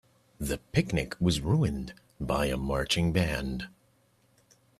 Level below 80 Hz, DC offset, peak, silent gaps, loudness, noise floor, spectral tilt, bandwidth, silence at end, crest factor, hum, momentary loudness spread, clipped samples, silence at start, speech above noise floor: -44 dBFS; under 0.1%; -12 dBFS; none; -29 LUFS; -67 dBFS; -5.5 dB/octave; 14.5 kHz; 1.1 s; 18 dB; none; 12 LU; under 0.1%; 0.4 s; 38 dB